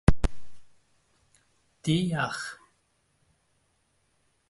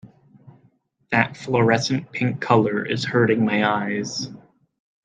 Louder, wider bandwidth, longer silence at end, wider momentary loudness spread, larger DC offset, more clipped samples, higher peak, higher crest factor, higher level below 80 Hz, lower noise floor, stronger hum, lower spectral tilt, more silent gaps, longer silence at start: second, -30 LUFS vs -21 LUFS; first, 11.5 kHz vs 9.2 kHz; first, 1.95 s vs 0.7 s; first, 12 LU vs 7 LU; neither; neither; second, -4 dBFS vs 0 dBFS; about the same, 26 dB vs 22 dB; first, -36 dBFS vs -64 dBFS; first, -71 dBFS vs -61 dBFS; neither; about the same, -6 dB/octave vs -5.5 dB/octave; neither; about the same, 0.1 s vs 0.05 s